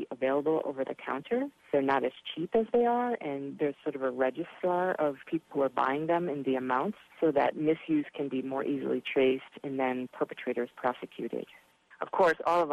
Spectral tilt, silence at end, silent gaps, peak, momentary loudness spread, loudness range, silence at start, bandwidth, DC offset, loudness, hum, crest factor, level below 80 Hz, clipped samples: -7 dB/octave; 0 s; none; -14 dBFS; 9 LU; 2 LU; 0 s; 12.5 kHz; under 0.1%; -31 LUFS; none; 16 dB; -72 dBFS; under 0.1%